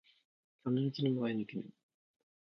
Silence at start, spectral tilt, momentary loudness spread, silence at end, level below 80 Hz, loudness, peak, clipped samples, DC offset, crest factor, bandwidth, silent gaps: 0.65 s; -7 dB/octave; 12 LU; 0.85 s; -82 dBFS; -37 LUFS; -20 dBFS; under 0.1%; under 0.1%; 18 dB; 6.2 kHz; none